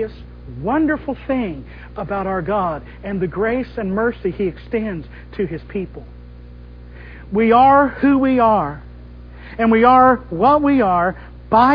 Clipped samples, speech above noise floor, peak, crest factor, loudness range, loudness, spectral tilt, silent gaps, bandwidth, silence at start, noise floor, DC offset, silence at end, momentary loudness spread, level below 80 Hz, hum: under 0.1%; 20 dB; 0 dBFS; 18 dB; 10 LU; -17 LUFS; -9.5 dB/octave; none; 5.2 kHz; 0 s; -37 dBFS; under 0.1%; 0 s; 21 LU; -38 dBFS; 60 Hz at -35 dBFS